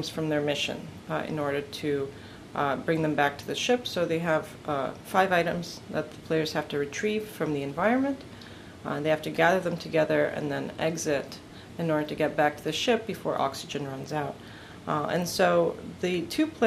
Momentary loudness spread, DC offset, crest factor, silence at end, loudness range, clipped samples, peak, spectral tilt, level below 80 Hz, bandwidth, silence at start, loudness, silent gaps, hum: 11 LU; under 0.1%; 22 dB; 0 s; 2 LU; under 0.1%; -8 dBFS; -5 dB/octave; -60 dBFS; 15.5 kHz; 0 s; -28 LUFS; none; none